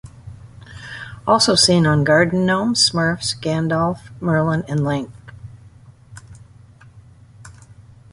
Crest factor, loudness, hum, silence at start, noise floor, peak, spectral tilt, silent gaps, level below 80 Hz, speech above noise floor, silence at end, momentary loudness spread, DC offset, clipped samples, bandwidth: 20 dB; -17 LUFS; none; 0.05 s; -45 dBFS; 0 dBFS; -4 dB/octave; none; -48 dBFS; 28 dB; 0.3 s; 22 LU; under 0.1%; under 0.1%; 11.5 kHz